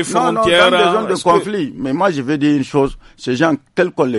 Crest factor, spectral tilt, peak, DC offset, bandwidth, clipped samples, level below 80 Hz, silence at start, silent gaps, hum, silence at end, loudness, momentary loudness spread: 14 dB; -5 dB/octave; 0 dBFS; under 0.1%; 11.5 kHz; under 0.1%; -44 dBFS; 0 s; none; none; 0 s; -15 LUFS; 10 LU